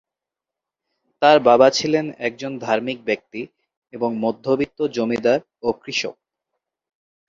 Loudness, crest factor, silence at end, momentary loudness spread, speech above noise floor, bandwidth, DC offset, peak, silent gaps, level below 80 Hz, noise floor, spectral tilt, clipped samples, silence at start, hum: -20 LUFS; 20 dB; 1.15 s; 13 LU; 67 dB; 7.8 kHz; under 0.1%; -2 dBFS; 3.77-3.82 s; -62 dBFS; -87 dBFS; -4.5 dB/octave; under 0.1%; 1.2 s; none